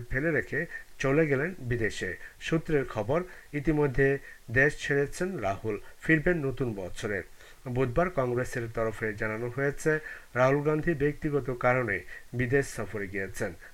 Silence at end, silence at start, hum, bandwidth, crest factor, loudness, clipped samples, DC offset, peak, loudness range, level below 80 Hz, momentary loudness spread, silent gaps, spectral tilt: 0 s; 0 s; none; 16.5 kHz; 20 dB; -29 LUFS; under 0.1%; under 0.1%; -10 dBFS; 3 LU; -46 dBFS; 10 LU; none; -6.5 dB/octave